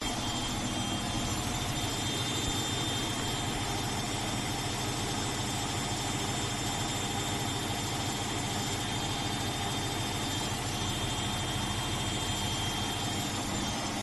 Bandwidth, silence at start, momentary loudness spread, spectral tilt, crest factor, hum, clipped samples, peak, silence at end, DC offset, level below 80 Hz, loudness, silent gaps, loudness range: 12.5 kHz; 0 s; 2 LU; -3 dB/octave; 14 dB; 50 Hz at -45 dBFS; under 0.1%; -18 dBFS; 0 s; under 0.1%; -46 dBFS; -32 LUFS; none; 1 LU